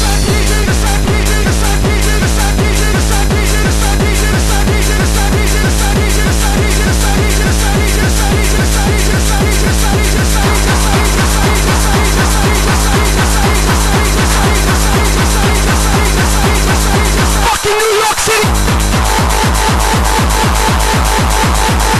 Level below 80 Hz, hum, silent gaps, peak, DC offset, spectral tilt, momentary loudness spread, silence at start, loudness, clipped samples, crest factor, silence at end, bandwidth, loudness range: -14 dBFS; none; none; 0 dBFS; under 0.1%; -4 dB/octave; 1 LU; 0 s; -11 LUFS; under 0.1%; 10 dB; 0 s; 13 kHz; 1 LU